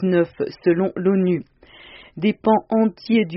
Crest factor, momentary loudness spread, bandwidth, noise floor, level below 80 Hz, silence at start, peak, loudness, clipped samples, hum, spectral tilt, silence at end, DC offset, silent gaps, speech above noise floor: 16 dB; 6 LU; 5.8 kHz; -45 dBFS; -58 dBFS; 0 s; -4 dBFS; -20 LUFS; under 0.1%; none; -6.5 dB/octave; 0 s; under 0.1%; none; 26 dB